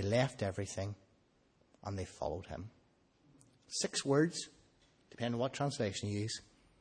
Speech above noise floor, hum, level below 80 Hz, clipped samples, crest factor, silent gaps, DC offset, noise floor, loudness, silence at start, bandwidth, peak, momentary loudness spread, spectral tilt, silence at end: 35 dB; none; -66 dBFS; under 0.1%; 20 dB; none; under 0.1%; -72 dBFS; -38 LUFS; 0 s; 10 kHz; -18 dBFS; 16 LU; -5 dB/octave; 0.4 s